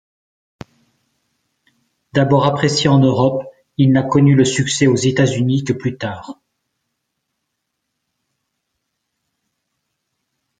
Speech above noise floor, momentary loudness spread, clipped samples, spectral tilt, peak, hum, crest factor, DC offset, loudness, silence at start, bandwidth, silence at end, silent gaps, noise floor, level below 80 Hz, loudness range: 61 dB; 14 LU; under 0.1%; -6 dB/octave; -2 dBFS; none; 18 dB; under 0.1%; -15 LUFS; 2.15 s; 9.4 kHz; 4.25 s; none; -75 dBFS; -54 dBFS; 11 LU